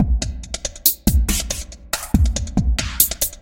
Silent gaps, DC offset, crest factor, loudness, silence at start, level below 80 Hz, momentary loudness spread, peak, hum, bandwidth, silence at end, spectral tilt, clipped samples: none; under 0.1%; 20 dB; -20 LUFS; 0 s; -24 dBFS; 11 LU; 0 dBFS; none; 17 kHz; 0.05 s; -3.5 dB/octave; under 0.1%